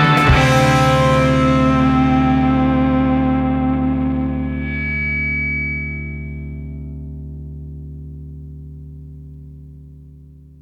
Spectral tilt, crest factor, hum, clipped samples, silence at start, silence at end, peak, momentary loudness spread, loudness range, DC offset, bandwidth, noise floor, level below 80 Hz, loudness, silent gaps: -6.5 dB/octave; 14 dB; none; under 0.1%; 0 s; 0.3 s; -2 dBFS; 22 LU; 20 LU; under 0.1%; 13 kHz; -41 dBFS; -28 dBFS; -16 LUFS; none